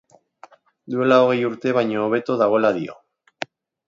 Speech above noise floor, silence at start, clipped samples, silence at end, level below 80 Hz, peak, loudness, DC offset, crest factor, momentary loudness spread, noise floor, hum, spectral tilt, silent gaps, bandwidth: 31 dB; 0.9 s; under 0.1%; 0.95 s; -70 dBFS; -4 dBFS; -19 LUFS; under 0.1%; 18 dB; 18 LU; -49 dBFS; none; -7 dB/octave; none; 7.6 kHz